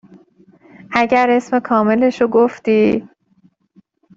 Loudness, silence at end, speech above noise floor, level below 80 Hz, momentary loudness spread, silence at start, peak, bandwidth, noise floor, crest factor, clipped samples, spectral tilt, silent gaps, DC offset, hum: -15 LUFS; 1.15 s; 41 dB; -56 dBFS; 4 LU; 0.9 s; 0 dBFS; 7.8 kHz; -56 dBFS; 16 dB; under 0.1%; -6.5 dB/octave; none; under 0.1%; none